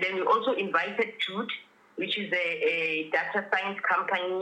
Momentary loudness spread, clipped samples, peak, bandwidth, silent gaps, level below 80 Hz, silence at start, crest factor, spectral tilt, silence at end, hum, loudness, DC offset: 8 LU; under 0.1%; -12 dBFS; 10 kHz; none; under -90 dBFS; 0 s; 16 dB; -4.5 dB/octave; 0 s; none; -28 LUFS; under 0.1%